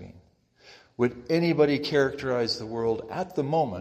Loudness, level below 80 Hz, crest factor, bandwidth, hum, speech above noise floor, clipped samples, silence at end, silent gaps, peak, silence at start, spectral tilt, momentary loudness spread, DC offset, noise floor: -26 LUFS; -60 dBFS; 18 dB; 15 kHz; none; 33 dB; under 0.1%; 0 s; none; -8 dBFS; 0 s; -6.5 dB/octave; 8 LU; under 0.1%; -59 dBFS